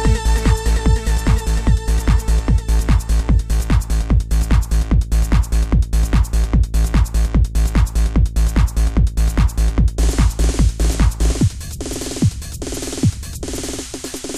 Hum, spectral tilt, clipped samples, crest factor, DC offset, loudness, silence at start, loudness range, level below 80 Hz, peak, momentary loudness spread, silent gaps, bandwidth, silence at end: none; -5.5 dB/octave; under 0.1%; 12 dB; under 0.1%; -18 LUFS; 0 s; 2 LU; -16 dBFS; -4 dBFS; 7 LU; none; 14 kHz; 0 s